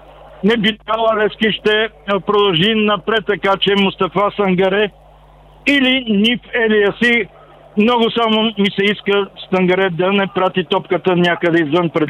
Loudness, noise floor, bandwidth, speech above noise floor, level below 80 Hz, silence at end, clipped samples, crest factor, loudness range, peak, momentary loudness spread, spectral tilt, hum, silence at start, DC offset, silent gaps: -15 LUFS; -44 dBFS; 10.5 kHz; 29 dB; -48 dBFS; 0 s; under 0.1%; 12 dB; 1 LU; -4 dBFS; 5 LU; -6.5 dB/octave; none; 0.25 s; under 0.1%; none